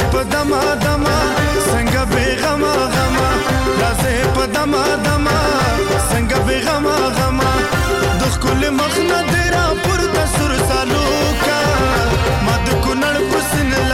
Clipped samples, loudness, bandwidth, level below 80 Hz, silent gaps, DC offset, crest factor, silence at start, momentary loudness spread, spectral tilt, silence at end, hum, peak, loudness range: under 0.1%; -15 LUFS; 17 kHz; -24 dBFS; none; under 0.1%; 8 dB; 0 s; 1 LU; -4.5 dB/octave; 0 s; none; -8 dBFS; 0 LU